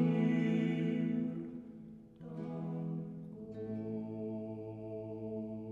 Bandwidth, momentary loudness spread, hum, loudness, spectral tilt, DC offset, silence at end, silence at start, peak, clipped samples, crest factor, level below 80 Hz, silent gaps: 7 kHz; 16 LU; none; -38 LUFS; -9.5 dB/octave; under 0.1%; 0 s; 0 s; -22 dBFS; under 0.1%; 16 dB; -72 dBFS; none